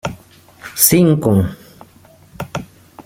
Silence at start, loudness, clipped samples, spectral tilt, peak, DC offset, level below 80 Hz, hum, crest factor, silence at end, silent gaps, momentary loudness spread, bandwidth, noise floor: 0.05 s; -13 LUFS; under 0.1%; -5 dB/octave; 0 dBFS; under 0.1%; -46 dBFS; none; 18 dB; 0.05 s; none; 20 LU; 16.5 kHz; -46 dBFS